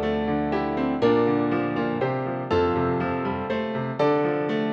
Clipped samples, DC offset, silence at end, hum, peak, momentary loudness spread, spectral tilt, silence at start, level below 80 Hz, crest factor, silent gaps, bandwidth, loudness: under 0.1%; under 0.1%; 0 s; none; -8 dBFS; 6 LU; -8.5 dB/octave; 0 s; -50 dBFS; 16 dB; none; 6.8 kHz; -24 LUFS